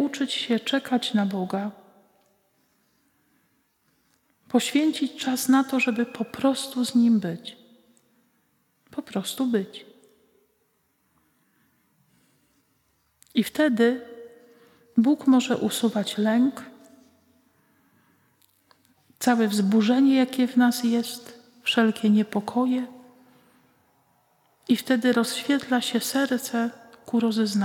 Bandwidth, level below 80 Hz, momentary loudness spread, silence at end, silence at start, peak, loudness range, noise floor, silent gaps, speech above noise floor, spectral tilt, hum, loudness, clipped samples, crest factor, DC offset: 17 kHz; -76 dBFS; 12 LU; 0 s; 0 s; -8 dBFS; 10 LU; -70 dBFS; none; 47 dB; -4.5 dB/octave; none; -24 LUFS; under 0.1%; 18 dB; under 0.1%